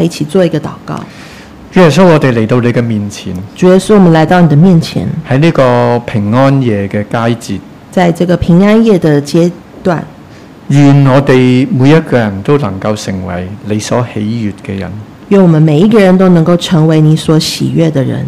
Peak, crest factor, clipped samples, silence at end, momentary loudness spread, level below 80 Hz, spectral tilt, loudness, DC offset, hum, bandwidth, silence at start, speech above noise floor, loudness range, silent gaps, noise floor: 0 dBFS; 8 dB; 2%; 0 s; 13 LU; -38 dBFS; -7 dB/octave; -8 LUFS; under 0.1%; none; 14 kHz; 0 s; 24 dB; 3 LU; none; -32 dBFS